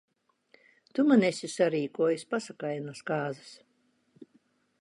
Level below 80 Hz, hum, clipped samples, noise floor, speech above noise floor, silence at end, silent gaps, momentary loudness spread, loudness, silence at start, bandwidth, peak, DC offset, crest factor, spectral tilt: -82 dBFS; none; under 0.1%; -72 dBFS; 43 dB; 0.55 s; none; 13 LU; -29 LUFS; 0.95 s; 11.5 kHz; -10 dBFS; under 0.1%; 20 dB; -5.5 dB/octave